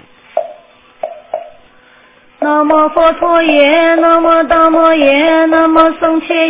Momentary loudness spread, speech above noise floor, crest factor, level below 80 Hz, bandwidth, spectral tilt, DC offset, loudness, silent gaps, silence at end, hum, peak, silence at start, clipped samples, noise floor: 17 LU; 35 dB; 10 dB; -46 dBFS; 4 kHz; -7 dB/octave; 1%; -9 LUFS; none; 0 s; none; 0 dBFS; 0.35 s; 0.1%; -44 dBFS